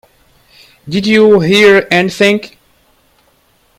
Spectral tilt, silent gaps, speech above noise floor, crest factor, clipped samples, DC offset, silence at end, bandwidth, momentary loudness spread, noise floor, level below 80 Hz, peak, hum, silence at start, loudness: -5 dB/octave; none; 44 dB; 12 dB; 0.3%; under 0.1%; 1.3 s; 15 kHz; 10 LU; -53 dBFS; -48 dBFS; 0 dBFS; none; 0.85 s; -9 LUFS